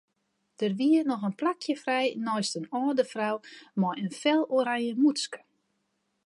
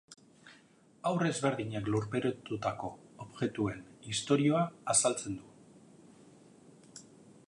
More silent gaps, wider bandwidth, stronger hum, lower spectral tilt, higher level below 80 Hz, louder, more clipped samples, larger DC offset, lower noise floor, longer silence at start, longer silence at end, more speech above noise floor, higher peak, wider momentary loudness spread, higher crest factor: neither; about the same, 11.5 kHz vs 11.5 kHz; neither; about the same, -5 dB/octave vs -4.5 dB/octave; second, -82 dBFS vs -66 dBFS; first, -28 LUFS vs -33 LUFS; neither; neither; first, -77 dBFS vs -63 dBFS; first, 0.6 s vs 0.1 s; first, 0.9 s vs 0.15 s; first, 49 dB vs 30 dB; about the same, -12 dBFS vs -12 dBFS; second, 8 LU vs 22 LU; second, 16 dB vs 24 dB